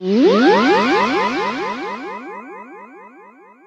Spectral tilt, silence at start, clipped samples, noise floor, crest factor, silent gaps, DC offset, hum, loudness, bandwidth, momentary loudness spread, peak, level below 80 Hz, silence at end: -5.5 dB/octave; 0 s; under 0.1%; -44 dBFS; 16 dB; none; under 0.1%; none; -16 LUFS; 8.4 kHz; 22 LU; -2 dBFS; -60 dBFS; 0.6 s